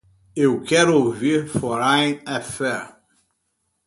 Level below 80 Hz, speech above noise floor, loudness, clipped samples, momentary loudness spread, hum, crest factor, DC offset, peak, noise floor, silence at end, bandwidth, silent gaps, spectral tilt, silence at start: -56 dBFS; 53 dB; -20 LUFS; under 0.1%; 12 LU; none; 18 dB; under 0.1%; -2 dBFS; -73 dBFS; 0.95 s; 11.5 kHz; none; -4.5 dB/octave; 0.35 s